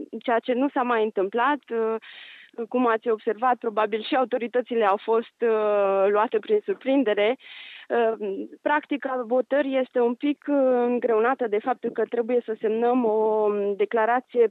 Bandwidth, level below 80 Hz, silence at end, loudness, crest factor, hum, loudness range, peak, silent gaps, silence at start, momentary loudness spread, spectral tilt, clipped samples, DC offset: 4.5 kHz; -90 dBFS; 0 s; -24 LUFS; 16 dB; none; 2 LU; -8 dBFS; none; 0 s; 6 LU; -7.5 dB/octave; under 0.1%; under 0.1%